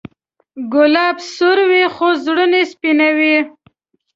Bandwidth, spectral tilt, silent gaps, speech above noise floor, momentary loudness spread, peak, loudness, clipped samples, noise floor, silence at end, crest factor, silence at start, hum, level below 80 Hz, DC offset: 7.6 kHz; -3.5 dB/octave; none; 43 dB; 6 LU; -2 dBFS; -13 LUFS; under 0.1%; -57 dBFS; 0.65 s; 14 dB; 0.55 s; none; -62 dBFS; under 0.1%